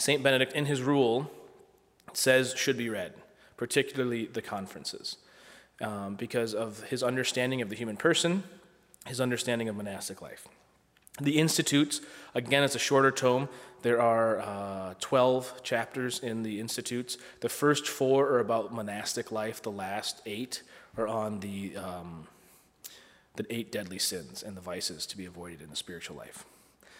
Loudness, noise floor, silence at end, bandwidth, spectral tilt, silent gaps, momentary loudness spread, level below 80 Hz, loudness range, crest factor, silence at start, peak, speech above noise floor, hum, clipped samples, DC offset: -30 LUFS; -63 dBFS; 0.55 s; 16 kHz; -4 dB/octave; none; 17 LU; -72 dBFS; 9 LU; 22 dB; 0 s; -8 dBFS; 32 dB; none; under 0.1%; under 0.1%